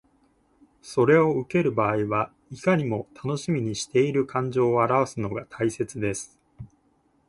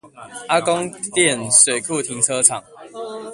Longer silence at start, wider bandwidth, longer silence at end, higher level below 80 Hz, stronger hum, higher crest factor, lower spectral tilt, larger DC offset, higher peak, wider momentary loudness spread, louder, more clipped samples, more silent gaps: first, 0.85 s vs 0.05 s; second, 11.5 kHz vs 13 kHz; first, 0.6 s vs 0 s; about the same, -58 dBFS vs -62 dBFS; neither; about the same, 18 dB vs 20 dB; first, -6 dB/octave vs -1.5 dB/octave; neither; second, -8 dBFS vs 0 dBFS; second, 11 LU vs 20 LU; second, -25 LUFS vs -16 LUFS; neither; neither